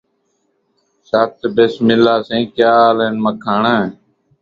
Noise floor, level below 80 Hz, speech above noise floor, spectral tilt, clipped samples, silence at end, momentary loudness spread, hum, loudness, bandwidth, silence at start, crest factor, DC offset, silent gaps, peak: -64 dBFS; -56 dBFS; 51 dB; -7 dB/octave; under 0.1%; 0.5 s; 8 LU; none; -14 LUFS; 7 kHz; 1.15 s; 16 dB; under 0.1%; none; 0 dBFS